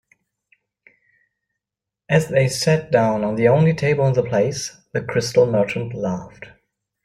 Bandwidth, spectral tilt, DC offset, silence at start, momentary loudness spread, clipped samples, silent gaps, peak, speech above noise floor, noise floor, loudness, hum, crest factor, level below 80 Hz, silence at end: 15 kHz; -6 dB/octave; under 0.1%; 2.1 s; 10 LU; under 0.1%; none; -2 dBFS; 68 dB; -86 dBFS; -19 LUFS; none; 18 dB; -54 dBFS; 0.55 s